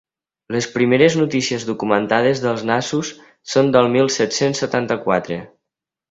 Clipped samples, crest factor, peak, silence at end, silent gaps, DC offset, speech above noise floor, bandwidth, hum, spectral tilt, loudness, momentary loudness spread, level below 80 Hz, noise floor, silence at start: under 0.1%; 18 dB; 0 dBFS; 0.65 s; none; under 0.1%; 66 dB; 8 kHz; none; -4.5 dB/octave; -18 LUFS; 10 LU; -58 dBFS; -83 dBFS; 0.5 s